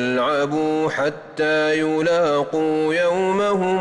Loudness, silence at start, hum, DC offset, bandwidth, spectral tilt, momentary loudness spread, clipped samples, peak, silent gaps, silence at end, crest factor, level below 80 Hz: -20 LUFS; 0 s; none; under 0.1%; 11 kHz; -5.5 dB/octave; 3 LU; under 0.1%; -10 dBFS; none; 0 s; 8 dB; -60 dBFS